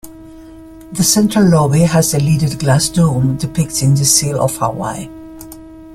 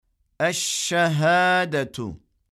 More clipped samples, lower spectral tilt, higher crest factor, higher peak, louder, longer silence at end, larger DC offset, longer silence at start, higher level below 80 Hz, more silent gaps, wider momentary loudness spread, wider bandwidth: neither; first, -5 dB/octave vs -3.5 dB/octave; about the same, 14 dB vs 16 dB; first, 0 dBFS vs -8 dBFS; first, -13 LUFS vs -21 LUFS; second, 0 s vs 0.35 s; neither; second, 0.05 s vs 0.4 s; first, -40 dBFS vs -56 dBFS; neither; first, 17 LU vs 13 LU; about the same, 15.5 kHz vs 15.5 kHz